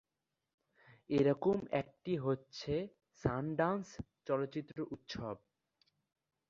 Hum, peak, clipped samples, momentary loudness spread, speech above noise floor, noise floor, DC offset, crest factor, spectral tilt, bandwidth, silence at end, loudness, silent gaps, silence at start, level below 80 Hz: none; -18 dBFS; under 0.1%; 13 LU; 53 dB; -89 dBFS; under 0.1%; 22 dB; -6 dB/octave; 7.4 kHz; 1.1 s; -38 LUFS; none; 1.1 s; -64 dBFS